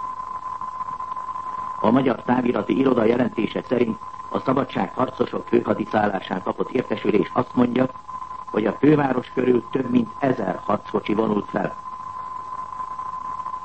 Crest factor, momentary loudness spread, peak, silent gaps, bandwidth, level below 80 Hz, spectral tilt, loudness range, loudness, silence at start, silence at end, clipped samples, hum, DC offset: 18 dB; 12 LU; -4 dBFS; none; 8.4 kHz; -56 dBFS; -8 dB/octave; 3 LU; -23 LUFS; 0 s; 0 s; under 0.1%; none; 0.4%